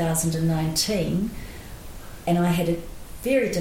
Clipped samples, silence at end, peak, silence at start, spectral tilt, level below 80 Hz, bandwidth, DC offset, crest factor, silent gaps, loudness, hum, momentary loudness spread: under 0.1%; 0 s; -10 dBFS; 0 s; -5 dB/octave; -40 dBFS; 17 kHz; under 0.1%; 14 dB; none; -24 LUFS; none; 18 LU